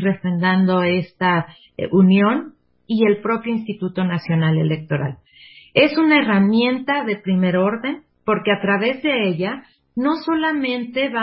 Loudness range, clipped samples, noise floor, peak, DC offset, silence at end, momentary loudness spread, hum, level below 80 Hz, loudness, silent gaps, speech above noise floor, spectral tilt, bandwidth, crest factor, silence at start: 3 LU; under 0.1%; -46 dBFS; -2 dBFS; under 0.1%; 0 s; 11 LU; none; -58 dBFS; -19 LUFS; none; 28 dB; -11.5 dB/octave; 5.8 kHz; 16 dB; 0 s